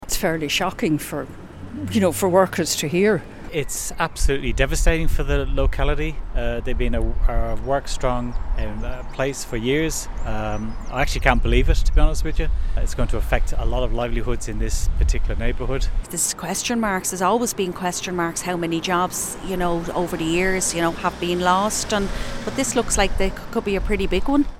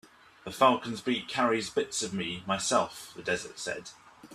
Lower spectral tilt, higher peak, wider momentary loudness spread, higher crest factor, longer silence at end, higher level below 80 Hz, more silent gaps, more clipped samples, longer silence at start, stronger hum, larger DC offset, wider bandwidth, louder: about the same, -4 dB/octave vs -3 dB/octave; first, 0 dBFS vs -8 dBFS; second, 8 LU vs 14 LU; about the same, 20 dB vs 22 dB; about the same, 0.05 s vs 0 s; first, -24 dBFS vs -68 dBFS; neither; neither; second, 0 s vs 0.45 s; neither; neither; about the same, 16.5 kHz vs 15 kHz; first, -23 LUFS vs -30 LUFS